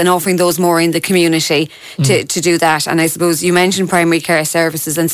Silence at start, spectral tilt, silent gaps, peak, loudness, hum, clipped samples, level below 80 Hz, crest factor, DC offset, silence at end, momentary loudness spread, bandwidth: 0 s; -4 dB/octave; none; -2 dBFS; -13 LUFS; none; under 0.1%; -56 dBFS; 12 dB; under 0.1%; 0 s; 3 LU; 16 kHz